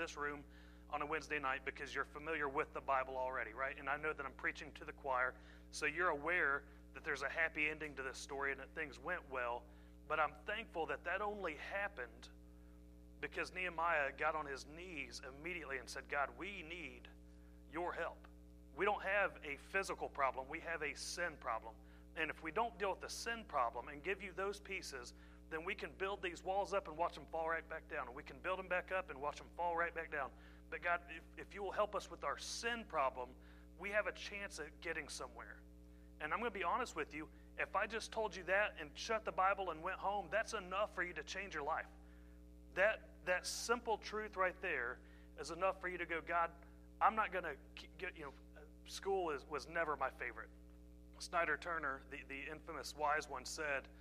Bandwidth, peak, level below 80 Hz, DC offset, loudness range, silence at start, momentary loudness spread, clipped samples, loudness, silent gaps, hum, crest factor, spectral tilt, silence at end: 15 kHz; -20 dBFS; -62 dBFS; under 0.1%; 4 LU; 0 s; 17 LU; under 0.1%; -42 LUFS; none; 60 Hz at -60 dBFS; 24 dB; -3 dB/octave; 0 s